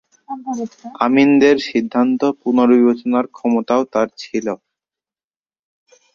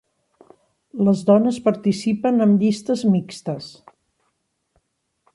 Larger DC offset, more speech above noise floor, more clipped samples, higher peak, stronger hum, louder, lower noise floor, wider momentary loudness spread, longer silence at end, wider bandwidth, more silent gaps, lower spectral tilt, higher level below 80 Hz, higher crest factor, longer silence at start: neither; first, over 74 dB vs 53 dB; neither; first, 0 dBFS vs -4 dBFS; neither; first, -16 LUFS vs -19 LUFS; first, under -90 dBFS vs -72 dBFS; about the same, 14 LU vs 14 LU; about the same, 1.6 s vs 1.65 s; second, 7 kHz vs 11.5 kHz; neither; second, -5.5 dB/octave vs -7.5 dB/octave; about the same, -62 dBFS vs -64 dBFS; about the same, 16 dB vs 18 dB; second, 0.3 s vs 0.95 s